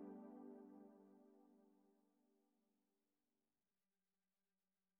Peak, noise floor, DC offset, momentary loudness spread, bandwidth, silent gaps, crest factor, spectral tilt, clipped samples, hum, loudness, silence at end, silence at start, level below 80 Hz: -46 dBFS; under -90 dBFS; under 0.1%; 9 LU; 2.8 kHz; none; 20 dB; -6.5 dB/octave; under 0.1%; none; -61 LUFS; 2.4 s; 0 s; under -90 dBFS